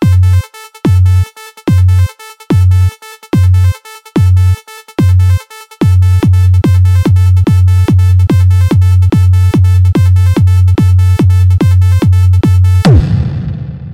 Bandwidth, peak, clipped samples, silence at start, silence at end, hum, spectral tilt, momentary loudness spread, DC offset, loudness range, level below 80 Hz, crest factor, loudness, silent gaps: 12 kHz; -2 dBFS; under 0.1%; 0 s; 0 s; none; -8 dB/octave; 8 LU; under 0.1%; 3 LU; -22 dBFS; 6 dB; -9 LUFS; none